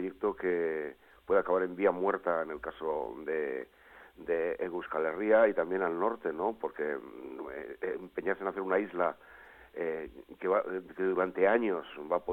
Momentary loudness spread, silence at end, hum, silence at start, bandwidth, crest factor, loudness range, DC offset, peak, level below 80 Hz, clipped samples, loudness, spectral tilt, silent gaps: 14 LU; 0 s; none; 0 s; 4.1 kHz; 18 dB; 4 LU; under 0.1%; -14 dBFS; -68 dBFS; under 0.1%; -32 LUFS; -8 dB/octave; none